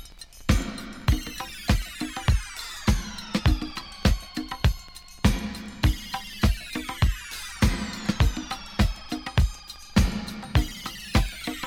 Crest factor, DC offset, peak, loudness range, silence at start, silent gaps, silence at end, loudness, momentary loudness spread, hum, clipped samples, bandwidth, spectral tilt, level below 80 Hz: 20 dB; under 0.1%; -6 dBFS; 1 LU; 0 s; none; 0 s; -27 LUFS; 9 LU; none; under 0.1%; 17.5 kHz; -5 dB/octave; -30 dBFS